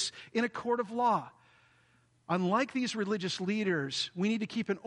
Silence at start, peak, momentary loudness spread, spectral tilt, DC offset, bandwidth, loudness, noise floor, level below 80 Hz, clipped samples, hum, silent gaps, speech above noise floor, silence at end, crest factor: 0 s; -16 dBFS; 4 LU; -4.5 dB/octave; under 0.1%; 10.5 kHz; -32 LUFS; -68 dBFS; -78 dBFS; under 0.1%; none; none; 36 dB; 0.05 s; 18 dB